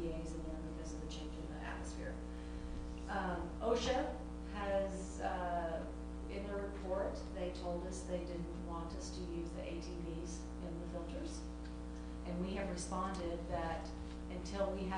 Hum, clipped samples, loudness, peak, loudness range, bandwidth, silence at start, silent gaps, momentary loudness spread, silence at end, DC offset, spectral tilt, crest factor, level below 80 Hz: 60 Hz at -50 dBFS; under 0.1%; -43 LUFS; -24 dBFS; 5 LU; 10 kHz; 0 s; none; 8 LU; 0 s; under 0.1%; -5.5 dB/octave; 18 dB; -48 dBFS